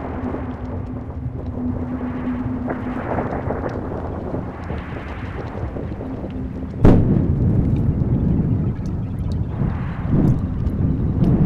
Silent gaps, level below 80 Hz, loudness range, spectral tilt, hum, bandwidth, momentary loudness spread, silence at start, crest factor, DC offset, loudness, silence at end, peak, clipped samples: none; -28 dBFS; 8 LU; -10.5 dB/octave; none; 6.6 kHz; 11 LU; 0 s; 18 dB; under 0.1%; -22 LUFS; 0 s; -4 dBFS; under 0.1%